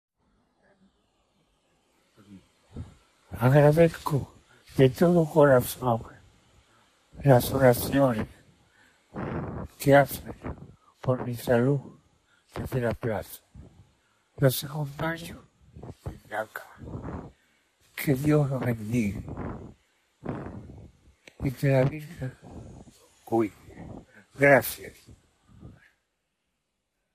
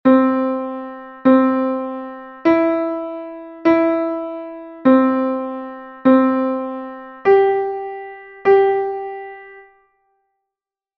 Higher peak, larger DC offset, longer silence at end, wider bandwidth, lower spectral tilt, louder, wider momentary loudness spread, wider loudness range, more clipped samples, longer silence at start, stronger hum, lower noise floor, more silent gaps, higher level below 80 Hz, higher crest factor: second, -6 dBFS vs -2 dBFS; neither; about the same, 1.45 s vs 1.35 s; first, 15 kHz vs 5.6 kHz; second, -6.5 dB/octave vs -8 dB/octave; second, -25 LUFS vs -17 LUFS; first, 24 LU vs 19 LU; first, 9 LU vs 3 LU; neither; first, 2.3 s vs 0.05 s; neither; second, -80 dBFS vs -87 dBFS; neither; first, -52 dBFS vs -60 dBFS; first, 22 dB vs 16 dB